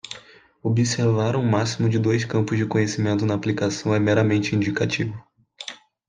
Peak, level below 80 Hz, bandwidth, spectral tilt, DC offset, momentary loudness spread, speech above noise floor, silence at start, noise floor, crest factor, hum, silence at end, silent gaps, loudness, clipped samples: -6 dBFS; -60 dBFS; 9.6 kHz; -6 dB/octave; under 0.1%; 16 LU; 27 dB; 0.05 s; -48 dBFS; 16 dB; none; 0.35 s; none; -22 LUFS; under 0.1%